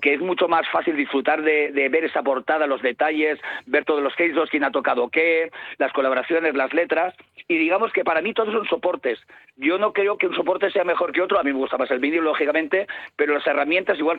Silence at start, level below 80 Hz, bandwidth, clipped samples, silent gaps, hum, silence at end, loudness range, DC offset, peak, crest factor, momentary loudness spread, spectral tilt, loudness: 0 s; -70 dBFS; 4.7 kHz; under 0.1%; none; none; 0 s; 1 LU; under 0.1%; -6 dBFS; 16 dB; 4 LU; -6.5 dB/octave; -21 LUFS